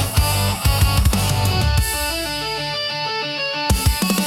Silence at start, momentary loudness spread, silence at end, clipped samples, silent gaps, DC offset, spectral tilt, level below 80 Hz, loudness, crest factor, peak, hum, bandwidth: 0 s; 5 LU; 0 s; under 0.1%; none; under 0.1%; -4 dB/octave; -24 dBFS; -19 LUFS; 14 dB; -4 dBFS; none; 17.5 kHz